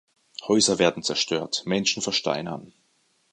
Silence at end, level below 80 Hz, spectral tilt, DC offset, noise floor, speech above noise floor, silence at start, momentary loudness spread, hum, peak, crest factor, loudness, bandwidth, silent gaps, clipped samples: 0.65 s; -62 dBFS; -3 dB/octave; under 0.1%; -67 dBFS; 43 dB; 0.4 s; 16 LU; none; -4 dBFS; 22 dB; -23 LUFS; 11.5 kHz; none; under 0.1%